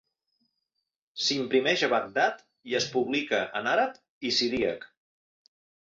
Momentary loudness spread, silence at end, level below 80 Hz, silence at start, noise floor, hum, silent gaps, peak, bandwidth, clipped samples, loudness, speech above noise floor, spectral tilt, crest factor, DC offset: 8 LU; 1.05 s; -66 dBFS; 1.15 s; -82 dBFS; none; 4.09-4.21 s; -10 dBFS; 7.8 kHz; under 0.1%; -27 LUFS; 55 dB; -3 dB/octave; 20 dB; under 0.1%